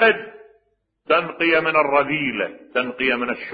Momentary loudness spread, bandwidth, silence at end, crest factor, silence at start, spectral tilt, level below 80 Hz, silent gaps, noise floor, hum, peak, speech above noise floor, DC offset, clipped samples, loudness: 8 LU; 5 kHz; 0 s; 18 dB; 0 s; -9 dB/octave; -60 dBFS; none; -67 dBFS; none; -2 dBFS; 46 dB; under 0.1%; under 0.1%; -20 LUFS